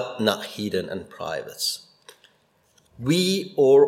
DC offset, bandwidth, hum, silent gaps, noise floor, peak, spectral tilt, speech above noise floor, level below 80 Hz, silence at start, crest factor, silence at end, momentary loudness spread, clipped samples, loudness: under 0.1%; 16.5 kHz; none; none; -63 dBFS; -4 dBFS; -4.5 dB/octave; 41 dB; -64 dBFS; 0 s; 20 dB; 0 s; 11 LU; under 0.1%; -25 LUFS